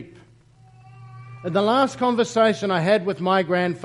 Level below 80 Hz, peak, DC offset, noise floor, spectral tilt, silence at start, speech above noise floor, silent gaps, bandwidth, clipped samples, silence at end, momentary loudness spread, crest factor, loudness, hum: -64 dBFS; -6 dBFS; under 0.1%; -52 dBFS; -5.5 dB/octave; 0 s; 32 dB; none; 11.5 kHz; under 0.1%; 0 s; 5 LU; 18 dB; -21 LUFS; none